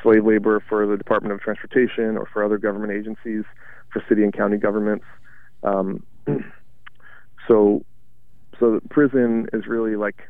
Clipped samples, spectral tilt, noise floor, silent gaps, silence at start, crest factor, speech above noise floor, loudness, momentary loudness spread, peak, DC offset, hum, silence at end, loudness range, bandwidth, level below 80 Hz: under 0.1%; -10 dB/octave; -56 dBFS; none; 0 s; 18 dB; 36 dB; -21 LUFS; 12 LU; -4 dBFS; 1%; none; 0.2 s; 3 LU; 3.8 kHz; -58 dBFS